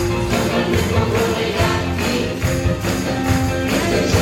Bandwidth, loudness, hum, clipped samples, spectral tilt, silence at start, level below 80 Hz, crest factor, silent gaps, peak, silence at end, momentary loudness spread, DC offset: 17 kHz; -18 LUFS; none; under 0.1%; -5 dB/octave; 0 s; -30 dBFS; 16 dB; none; -2 dBFS; 0 s; 3 LU; under 0.1%